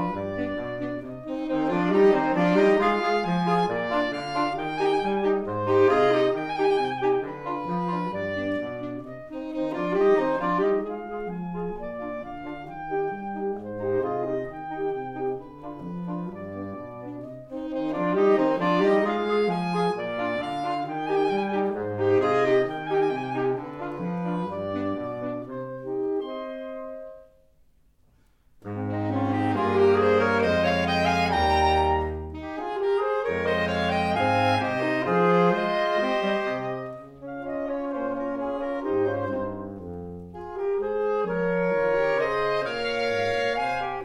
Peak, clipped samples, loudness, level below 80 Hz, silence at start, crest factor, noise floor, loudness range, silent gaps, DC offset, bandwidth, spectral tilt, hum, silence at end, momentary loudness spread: -8 dBFS; under 0.1%; -25 LUFS; -48 dBFS; 0 s; 18 dB; -60 dBFS; 9 LU; none; under 0.1%; 10.5 kHz; -7 dB/octave; none; 0 s; 14 LU